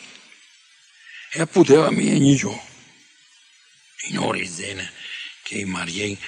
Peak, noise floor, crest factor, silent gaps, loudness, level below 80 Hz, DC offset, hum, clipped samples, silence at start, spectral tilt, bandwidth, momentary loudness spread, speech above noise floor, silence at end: -2 dBFS; -54 dBFS; 22 dB; none; -21 LUFS; -62 dBFS; under 0.1%; none; under 0.1%; 0 s; -5 dB/octave; 10.5 kHz; 19 LU; 34 dB; 0 s